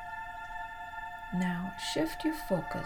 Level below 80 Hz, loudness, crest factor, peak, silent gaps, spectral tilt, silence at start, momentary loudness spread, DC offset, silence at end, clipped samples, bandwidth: -52 dBFS; -36 LUFS; 16 dB; -18 dBFS; none; -5 dB/octave; 0 s; 9 LU; under 0.1%; 0 s; under 0.1%; 19.5 kHz